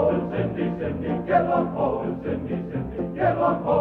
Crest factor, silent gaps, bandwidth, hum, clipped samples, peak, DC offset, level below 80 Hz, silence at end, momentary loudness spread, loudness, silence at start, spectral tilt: 16 dB; none; 4.5 kHz; none; under 0.1%; -8 dBFS; under 0.1%; -46 dBFS; 0 s; 8 LU; -25 LUFS; 0 s; -10.5 dB/octave